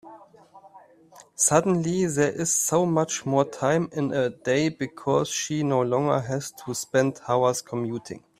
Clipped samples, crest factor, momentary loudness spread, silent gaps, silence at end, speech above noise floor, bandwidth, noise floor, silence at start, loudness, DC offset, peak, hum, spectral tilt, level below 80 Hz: under 0.1%; 20 dB; 9 LU; none; 0.2 s; 28 dB; 16 kHz; -52 dBFS; 0.05 s; -24 LUFS; under 0.1%; -4 dBFS; none; -4.5 dB/octave; -62 dBFS